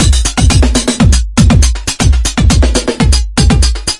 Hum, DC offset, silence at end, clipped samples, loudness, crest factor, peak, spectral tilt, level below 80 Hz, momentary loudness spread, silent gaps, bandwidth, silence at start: none; under 0.1%; 0 s; 0.3%; -10 LUFS; 8 dB; 0 dBFS; -4.5 dB/octave; -12 dBFS; 3 LU; none; 11.5 kHz; 0 s